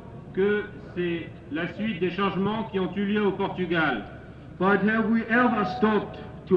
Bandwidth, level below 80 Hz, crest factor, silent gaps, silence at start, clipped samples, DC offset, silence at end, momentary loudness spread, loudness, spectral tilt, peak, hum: 5.8 kHz; -52 dBFS; 16 dB; none; 0 s; under 0.1%; under 0.1%; 0 s; 12 LU; -26 LUFS; -8.5 dB/octave; -10 dBFS; none